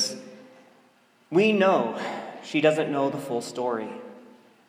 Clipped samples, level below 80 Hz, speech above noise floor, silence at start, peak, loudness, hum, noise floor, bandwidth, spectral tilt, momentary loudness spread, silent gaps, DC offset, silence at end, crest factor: under 0.1%; -80 dBFS; 37 dB; 0 s; -6 dBFS; -25 LUFS; none; -60 dBFS; 16 kHz; -4.5 dB/octave; 19 LU; none; under 0.1%; 0.45 s; 20 dB